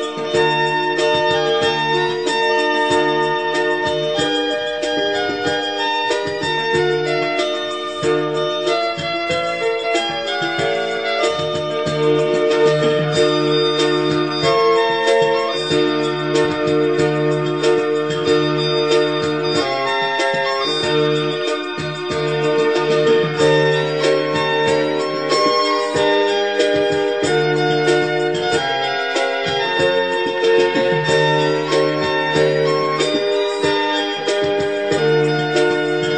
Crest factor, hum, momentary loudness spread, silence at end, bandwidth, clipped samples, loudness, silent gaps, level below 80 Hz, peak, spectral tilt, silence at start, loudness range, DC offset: 12 dB; none; 5 LU; 0 s; 9.2 kHz; under 0.1%; -17 LUFS; none; -54 dBFS; -4 dBFS; -4.5 dB/octave; 0 s; 3 LU; 0.3%